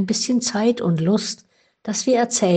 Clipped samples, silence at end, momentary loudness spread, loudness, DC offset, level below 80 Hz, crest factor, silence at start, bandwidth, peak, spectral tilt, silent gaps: under 0.1%; 0 s; 10 LU; -20 LUFS; under 0.1%; -62 dBFS; 14 dB; 0 s; 9.4 kHz; -6 dBFS; -4.5 dB/octave; none